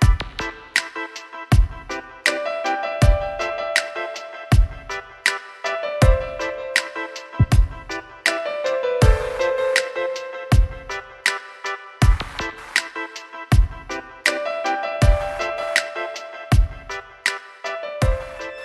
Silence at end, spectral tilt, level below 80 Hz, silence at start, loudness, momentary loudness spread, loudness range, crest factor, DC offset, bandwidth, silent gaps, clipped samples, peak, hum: 0 s; -5 dB/octave; -24 dBFS; 0 s; -22 LUFS; 12 LU; 2 LU; 20 dB; under 0.1%; 12.5 kHz; none; under 0.1%; -2 dBFS; none